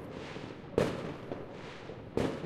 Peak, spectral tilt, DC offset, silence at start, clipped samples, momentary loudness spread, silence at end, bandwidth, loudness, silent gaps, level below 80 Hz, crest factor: -12 dBFS; -6.5 dB/octave; under 0.1%; 0 s; under 0.1%; 12 LU; 0 s; 15 kHz; -38 LUFS; none; -56 dBFS; 24 dB